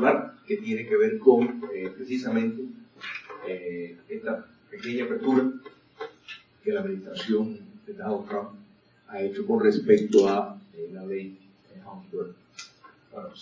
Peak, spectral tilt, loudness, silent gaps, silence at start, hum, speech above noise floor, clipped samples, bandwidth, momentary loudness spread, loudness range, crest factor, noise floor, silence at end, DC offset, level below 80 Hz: -4 dBFS; -6.5 dB/octave; -27 LUFS; none; 0 s; none; 27 dB; under 0.1%; 7.6 kHz; 23 LU; 7 LU; 24 dB; -53 dBFS; 0 s; under 0.1%; -74 dBFS